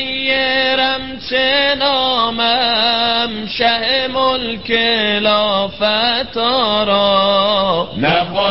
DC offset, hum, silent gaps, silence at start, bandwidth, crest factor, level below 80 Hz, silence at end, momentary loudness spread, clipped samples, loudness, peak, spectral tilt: 1%; none; none; 0 s; 5.8 kHz; 14 dB; -46 dBFS; 0 s; 4 LU; under 0.1%; -14 LUFS; -2 dBFS; -8 dB/octave